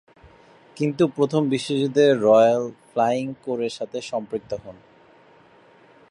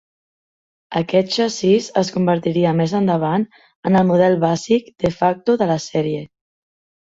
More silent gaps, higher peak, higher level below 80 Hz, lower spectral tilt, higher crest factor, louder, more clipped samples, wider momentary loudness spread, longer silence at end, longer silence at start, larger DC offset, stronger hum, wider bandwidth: second, none vs 3.76-3.83 s; second, -6 dBFS vs -2 dBFS; second, -64 dBFS vs -54 dBFS; about the same, -6 dB/octave vs -6.5 dB/octave; about the same, 18 dB vs 16 dB; second, -22 LUFS vs -18 LUFS; neither; first, 15 LU vs 8 LU; first, 1.4 s vs 0.8 s; second, 0.75 s vs 0.9 s; neither; neither; first, 11.5 kHz vs 7.8 kHz